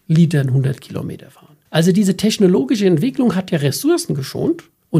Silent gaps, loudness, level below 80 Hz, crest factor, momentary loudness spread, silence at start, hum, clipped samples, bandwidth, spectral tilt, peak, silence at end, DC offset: none; -17 LUFS; -56 dBFS; 16 dB; 12 LU; 0.1 s; none; under 0.1%; 15.5 kHz; -6.5 dB/octave; 0 dBFS; 0 s; under 0.1%